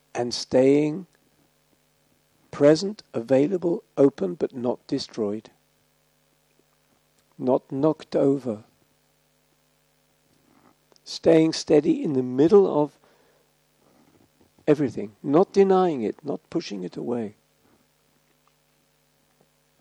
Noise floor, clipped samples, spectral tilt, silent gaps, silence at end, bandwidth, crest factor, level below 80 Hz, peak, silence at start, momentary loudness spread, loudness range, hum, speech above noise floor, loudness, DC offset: -66 dBFS; under 0.1%; -6.5 dB/octave; none; 2.5 s; 11 kHz; 20 dB; -68 dBFS; -4 dBFS; 0.15 s; 14 LU; 9 LU; none; 44 dB; -23 LUFS; under 0.1%